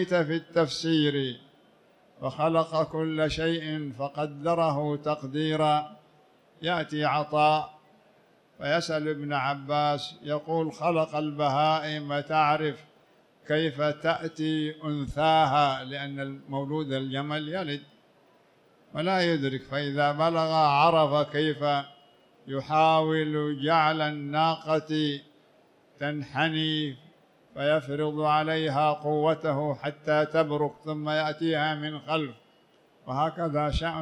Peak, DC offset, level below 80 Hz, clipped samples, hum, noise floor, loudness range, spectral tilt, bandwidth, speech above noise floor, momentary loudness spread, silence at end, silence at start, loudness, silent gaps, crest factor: -10 dBFS; under 0.1%; -54 dBFS; under 0.1%; none; -62 dBFS; 5 LU; -6 dB/octave; 10.5 kHz; 35 dB; 10 LU; 0 s; 0 s; -27 LUFS; none; 18 dB